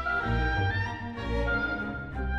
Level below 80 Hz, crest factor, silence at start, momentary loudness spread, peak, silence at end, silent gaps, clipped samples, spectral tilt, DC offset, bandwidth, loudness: -36 dBFS; 14 dB; 0 s; 7 LU; -16 dBFS; 0 s; none; under 0.1%; -7 dB/octave; under 0.1%; 7.4 kHz; -30 LUFS